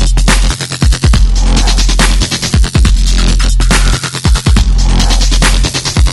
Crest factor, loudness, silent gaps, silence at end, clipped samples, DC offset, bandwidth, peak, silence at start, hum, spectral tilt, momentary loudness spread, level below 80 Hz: 8 dB; -11 LUFS; none; 0 s; 0.2%; under 0.1%; 12 kHz; 0 dBFS; 0 s; none; -3.5 dB/octave; 2 LU; -8 dBFS